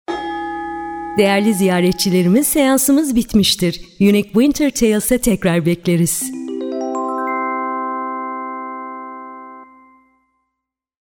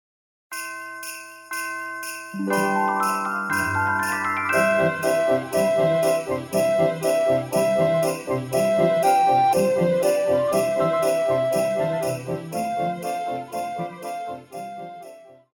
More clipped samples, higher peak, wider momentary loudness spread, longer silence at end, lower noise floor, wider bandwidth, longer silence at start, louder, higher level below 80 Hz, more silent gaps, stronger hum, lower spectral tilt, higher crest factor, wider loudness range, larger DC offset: neither; first, -2 dBFS vs -8 dBFS; about the same, 13 LU vs 13 LU; first, 1.5 s vs 0.2 s; first, -80 dBFS vs -44 dBFS; about the same, 19 kHz vs 19.5 kHz; second, 0.1 s vs 0.5 s; first, -16 LUFS vs -22 LUFS; first, -42 dBFS vs -62 dBFS; neither; neither; about the same, -4.5 dB/octave vs -5 dB/octave; about the same, 16 dB vs 16 dB; first, 11 LU vs 7 LU; neither